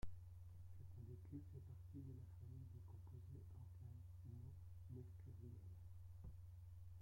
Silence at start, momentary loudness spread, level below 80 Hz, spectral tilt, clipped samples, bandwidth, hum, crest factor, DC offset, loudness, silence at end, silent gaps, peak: 0 s; 4 LU; -66 dBFS; -8.5 dB/octave; under 0.1%; 16.5 kHz; none; 18 dB; under 0.1%; -59 LUFS; 0 s; none; -38 dBFS